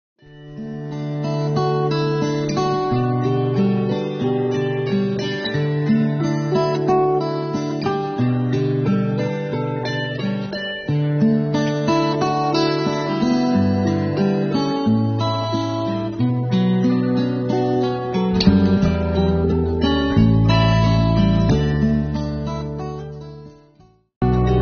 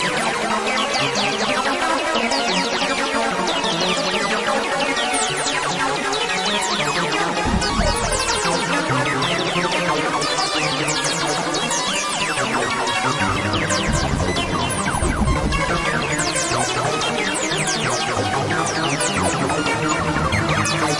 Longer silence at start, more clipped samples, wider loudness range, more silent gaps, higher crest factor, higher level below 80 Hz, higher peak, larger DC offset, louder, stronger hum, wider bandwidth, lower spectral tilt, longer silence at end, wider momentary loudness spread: first, 0.3 s vs 0 s; neither; first, 4 LU vs 1 LU; first, 24.16-24.21 s vs none; about the same, 18 dB vs 14 dB; about the same, -34 dBFS vs -34 dBFS; first, -2 dBFS vs -6 dBFS; neither; about the same, -19 LUFS vs -19 LUFS; neither; second, 6.6 kHz vs 11.5 kHz; first, -6.5 dB/octave vs -3 dB/octave; about the same, 0 s vs 0 s; first, 8 LU vs 2 LU